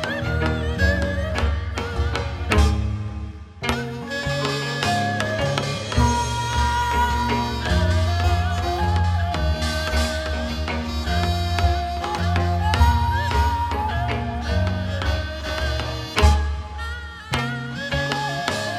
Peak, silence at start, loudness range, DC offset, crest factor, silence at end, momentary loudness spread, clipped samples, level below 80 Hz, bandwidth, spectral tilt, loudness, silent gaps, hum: 0 dBFS; 0 s; 3 LU; under 0.1%; 22 dB; 0 s; 7 LU; under 0.1%; -26 dBFS; 14.5 kHz; -5 dB/octave; -23 LUFS; none; none